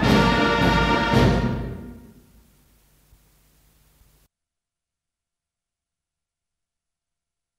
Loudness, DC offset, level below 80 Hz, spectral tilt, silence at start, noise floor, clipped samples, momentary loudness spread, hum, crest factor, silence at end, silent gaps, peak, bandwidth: -19 LUFS; under 0.1%; -36 dBFS; -6 dB/octave; 0 s; -87 dBFS; under 0.1%; 18 LU; none; 20 dB; 5.6 s; none; -4 dBFS; 15.5 kHz